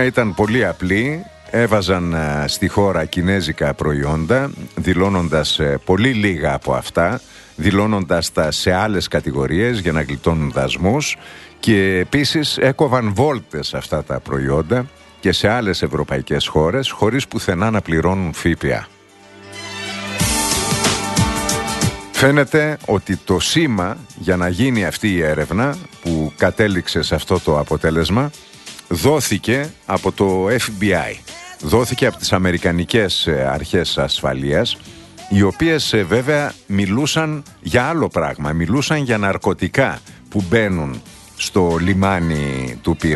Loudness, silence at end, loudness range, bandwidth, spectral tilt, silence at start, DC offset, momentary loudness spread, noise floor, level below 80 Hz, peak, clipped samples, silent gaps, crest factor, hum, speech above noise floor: -18 LUFS; 0 s; 2 LU; 12.5 kHz; -5 dB/octave; 0 s; under 0.1%; 8 LU; -43 dBFS; -36 dBFS; 0 dBFS; under 0.1%; none; 18 dB; none; 26 dB